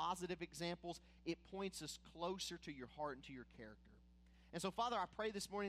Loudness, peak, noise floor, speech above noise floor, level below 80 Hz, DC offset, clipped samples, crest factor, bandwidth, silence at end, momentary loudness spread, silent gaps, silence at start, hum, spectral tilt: -47 LUFS; -30 dBFS; -68 dBFS; 20 dB; -68 dBFS; under 0.1%; under 0.1%; 18 dB; 15.5 kHz; 0 s; 14 LU; none; 0 s; none; -4 dB/octave